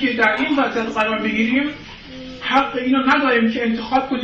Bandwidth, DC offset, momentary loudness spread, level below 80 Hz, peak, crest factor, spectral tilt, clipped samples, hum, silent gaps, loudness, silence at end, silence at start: 7.6 kHz; under 0.1%; 14 LU; -48 dBFS; -4 dBFS; 14 dB; -5 dB/octave; under 0.1%; none; none; -18 LUFS; 0 s; 0 s